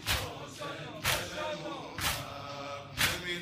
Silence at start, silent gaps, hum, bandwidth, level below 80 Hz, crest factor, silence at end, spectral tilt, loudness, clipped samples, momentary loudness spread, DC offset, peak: 0 s; none; none; 16 kHz; -50 dBFS; 22 dB; 0 s; -2.5 dB/octave; -34 LUFS; under 0.1%; 11 LU; under 0.1%; -14 dBFS